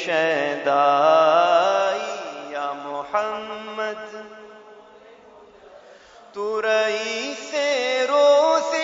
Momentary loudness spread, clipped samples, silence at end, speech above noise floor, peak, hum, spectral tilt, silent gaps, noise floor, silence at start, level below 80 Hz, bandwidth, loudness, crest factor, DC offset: 16 LU; under 0.1%; 0 s; 29 dB; -4 dBFS; none; -2.5 dB/octave; none; -48 dBFS; 0 s; -72 dBFS; 7.8 kHz; -21 LUFS; 18 dB; under 0.1%